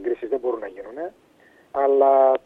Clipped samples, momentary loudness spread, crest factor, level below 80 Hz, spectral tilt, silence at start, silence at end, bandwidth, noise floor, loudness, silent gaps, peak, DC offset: under 0.1%; 19 LU; 16 dB; -64 dBFS; -6.5 dB/octave; 0 s; 0.1 s; 3.9 kHz; -46 dBFS; -21 LUFS; none; -6 dBFS; under 0.1%